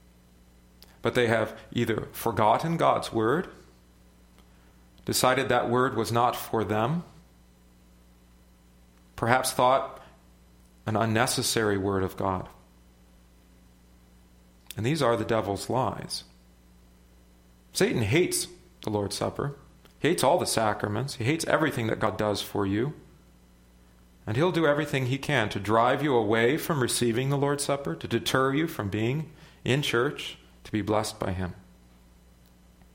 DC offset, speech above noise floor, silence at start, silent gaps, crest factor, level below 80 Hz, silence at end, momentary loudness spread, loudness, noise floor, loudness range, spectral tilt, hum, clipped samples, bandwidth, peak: under 0.1%; 31 dB; 1.05 s; none; 24 dB; -56 dBFS; 1.35 s; 11 LU; -27 LUFS; -57 dBFS; 5 LU; -4.5 dB/octave; 60 Hz at -55 dBFS; under 0.1%; 16.5 kHz; -4 dBFS